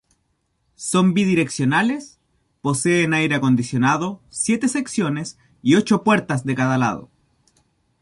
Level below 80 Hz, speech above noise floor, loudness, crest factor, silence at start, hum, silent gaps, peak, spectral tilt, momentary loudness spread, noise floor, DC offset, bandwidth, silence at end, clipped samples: -58 dBFS; 50 dB; -20 LUFS; 16 dB; 0.8 s; none; none; -4 dBFS; -5 dB/octave; 11 LU; -69 dBFS; under 0.1%; 11.5 kHz; 0.95 s; under 0.1%